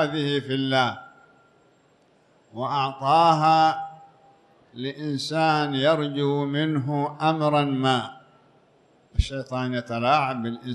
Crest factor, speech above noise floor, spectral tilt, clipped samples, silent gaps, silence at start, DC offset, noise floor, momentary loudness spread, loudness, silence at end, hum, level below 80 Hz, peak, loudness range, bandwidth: 18 dB; 38 dB; -6 dB/octave; under 0.1%; none; 0 s; under 0.1%; -60 dBFS; 13 LU; -23 LUFS; 0 s; none; -40 dBFS; -6 dBFS; 3 LU; 11 kHz